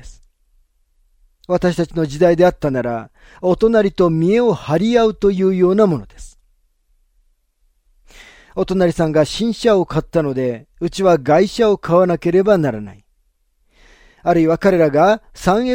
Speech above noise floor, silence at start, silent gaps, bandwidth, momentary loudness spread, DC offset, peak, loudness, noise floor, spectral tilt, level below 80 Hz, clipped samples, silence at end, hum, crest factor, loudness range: 47 dB; 0.05 s; none; 16 kHz; 9 LU; under 0.1%; -2 dBFS; -16 LUFS; -62 dBFS; -7 dB/octave; -42 dBFS; under 0.1%; 0 s; none; 16 dB; 5 LU